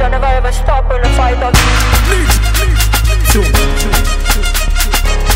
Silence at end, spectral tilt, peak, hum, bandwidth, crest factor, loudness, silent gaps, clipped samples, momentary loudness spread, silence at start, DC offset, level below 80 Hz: 0 s; -3.5 dB/octave; 0 dBFS; none; 16.5 kHz; 10 dB; -12 LUFS; none; under 0.1%; 4 LU; 0 s; under 0.1%; -12 dBFS